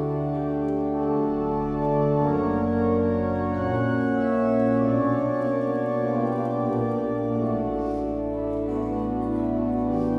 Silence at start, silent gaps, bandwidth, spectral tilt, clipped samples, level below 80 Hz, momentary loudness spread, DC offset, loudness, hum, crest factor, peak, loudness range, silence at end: 0 s; none; 5.8 kHz; -10 dB/octave; under 0.1%; -44 dBFS; 5 LU; under 0.1%; -25 LUFS; none; 14 dB; -10 dBFS; 3 LU; 0 s